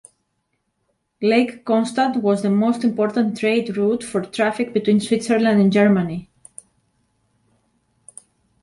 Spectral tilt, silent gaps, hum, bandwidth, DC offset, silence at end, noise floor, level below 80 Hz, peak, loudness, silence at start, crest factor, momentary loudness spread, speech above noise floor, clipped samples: -6 dB/octave; none; none; 11.5 kHz; under 0.1%; 2.4 s; -72 dBFS; -62 dBFS; -4 dBFS; -19 LUFS; 1.2 s; 16 dB; 6 LU; 54 dB; under 0.1%